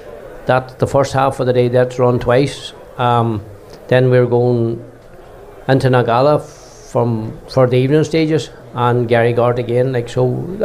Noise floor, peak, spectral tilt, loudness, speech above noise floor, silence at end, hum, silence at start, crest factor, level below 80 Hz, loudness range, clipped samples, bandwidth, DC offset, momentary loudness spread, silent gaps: -37 dBFS; -2 dBFS; -7 dB/octave; -15 LUFS; 23 dB; 0 s; none; 0 s; 14 dB; -42 dBFS; 2 LU; under 0.1%; 12 kHz; under 0.1%; 10 LU; none